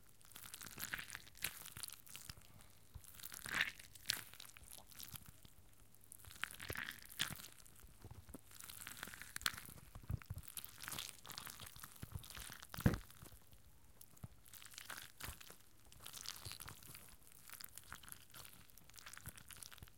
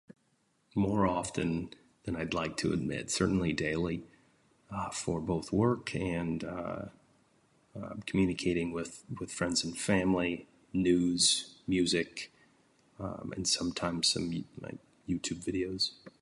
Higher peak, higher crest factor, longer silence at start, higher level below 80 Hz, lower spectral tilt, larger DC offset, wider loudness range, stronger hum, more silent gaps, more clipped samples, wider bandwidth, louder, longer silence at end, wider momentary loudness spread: about the same, -14 dBFS vs -14 dBFS; first, 36 dB vs 20 dB; second, 0 s vs 0.75 s; second, -62 dBFS vs -54 dBFS; about the same, -3 dB/octave vs -4 dB/octave; neither; about the same, 7 LU vs 5 LU; neither; neither; neither; first, 17 kHz vs 11.5 kHz; second, -48 LUFS vs -32 LUFS; about the same, 0 s vs 0.1 s; first, 18 LU vs 14 LU